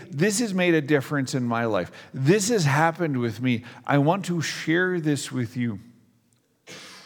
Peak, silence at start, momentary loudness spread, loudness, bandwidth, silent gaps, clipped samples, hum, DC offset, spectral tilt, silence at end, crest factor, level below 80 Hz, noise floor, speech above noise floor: -6 dBFS; 0 s; 9 LU; -24 LUFS; 18.5 kHz; none; under 0.1%; none; under 0.1%; -5 dB/octave; 0.05 s; 20 dB; -70 dBFS; -66 dBFS; 42 dB